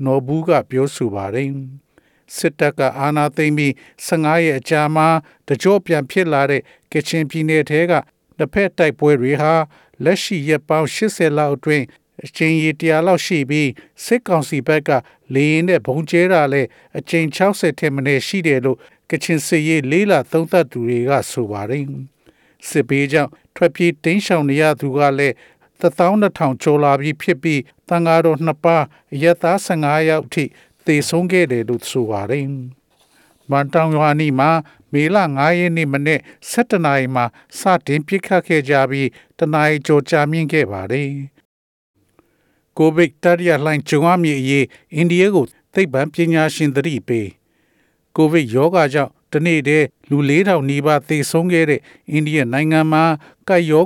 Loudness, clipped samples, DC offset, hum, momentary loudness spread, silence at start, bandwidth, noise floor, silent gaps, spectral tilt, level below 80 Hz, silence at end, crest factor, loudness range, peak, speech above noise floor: -17 LUFS; under 0.1%; under 0.1%; none; 8 LU; 0 s; 17.5 kHz; -62 dBFS; 41.45-41.94 s; -6 dB/octave; -60 dBFS; 0 s; 14 dB; 3 LU; -2 dBFS; 46 dB